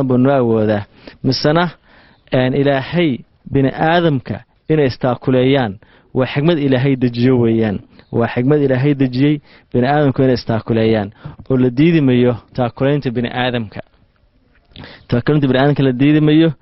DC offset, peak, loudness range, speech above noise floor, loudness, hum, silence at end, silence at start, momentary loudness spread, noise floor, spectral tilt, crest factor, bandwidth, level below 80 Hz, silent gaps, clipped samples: under 0.1%; 0 dBFS; 2 LU; 40 dB; -15 LUFS; none; 0.05 s; 0 s; 9 LU; -55 dBFS; -6 dB/octave; 14 dB; 5.8 kHz; -44 dBFS; none; under 0.1%